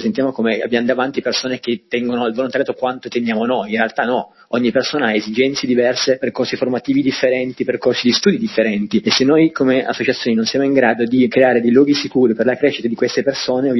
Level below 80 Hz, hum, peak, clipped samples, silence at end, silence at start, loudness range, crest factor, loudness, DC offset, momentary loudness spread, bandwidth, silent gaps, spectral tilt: -58 dBFS; none; 0 dBFS; under 0.1%; 0 s; 0 s; 4 LU; 16 dB; -16 LUFS; under 0.1%; 7 LU; 11 kHz; none; -4.5 dB/octave